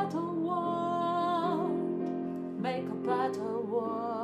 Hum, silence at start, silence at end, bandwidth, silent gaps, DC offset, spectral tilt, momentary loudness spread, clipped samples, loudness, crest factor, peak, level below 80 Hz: none; 0 s; 0 s; 11.5 kHz; none; under 0.1%; -7.5 dB/octave; 5 LU; under 0.1%; -32 LUFS; 14 dB; -18 dBFS; -76 dBFS